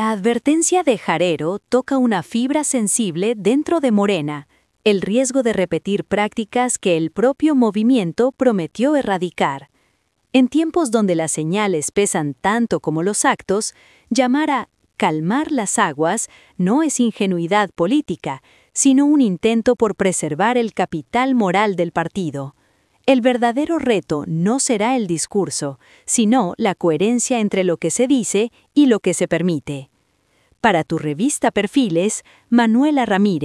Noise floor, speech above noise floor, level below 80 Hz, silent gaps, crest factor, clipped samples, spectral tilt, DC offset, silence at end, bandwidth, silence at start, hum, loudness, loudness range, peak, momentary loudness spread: -62 dBFS; 45 dB; -58 dBFS; none; 16 dB; under 0.1%; -4.5 dB/octave; under 0.1%; 0 s; 12 kHz; 0 s; none; -18 LUFS; 2 LU; -2 dBFS; 7 LU